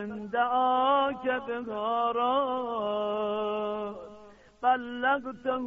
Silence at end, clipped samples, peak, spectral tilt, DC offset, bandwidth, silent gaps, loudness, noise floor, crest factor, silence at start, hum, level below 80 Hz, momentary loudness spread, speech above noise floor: 0 s; under 0.1%; -14 dBFS; -2 dB/octave; under 0.1%; 6.8 kHz; none; -29 LUFS; -52 dBFS; 16 dB; 0 s; none; -66 dBFS; 9 LU; 24 dB